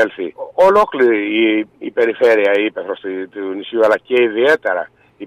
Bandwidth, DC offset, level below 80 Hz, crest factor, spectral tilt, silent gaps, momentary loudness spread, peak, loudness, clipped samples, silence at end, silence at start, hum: 12 kHz; under 0.1%; -56 dBFS; 12 dB; -5 dB/octave; none; 13 LU; -4 dBFS; -15 LUFS; under 0.1%; 0 s; 0 s; none